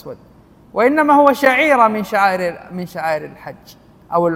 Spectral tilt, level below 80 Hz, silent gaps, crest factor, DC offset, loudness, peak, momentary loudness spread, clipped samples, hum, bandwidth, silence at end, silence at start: -5.5 dB/octave; -56 dBFS; none; 16 dB; under 0.1%; -15 LUFS; 0 dBFS; 20 LU; under 0.1%; none; 16.5 kHz; 0 s; 0.05 s